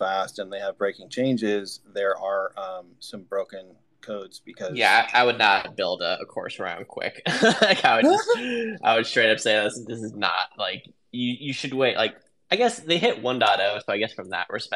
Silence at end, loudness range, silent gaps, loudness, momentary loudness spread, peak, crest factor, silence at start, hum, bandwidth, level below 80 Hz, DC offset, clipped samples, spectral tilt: 0 s; 7 LU; none; -23 LUFS; 17 LU; -2 dBFS; 22 dB; 0 s; none; 13 kHz; -74 dBFS; under 0.1%; under 0.1%; -3.5 dB/octave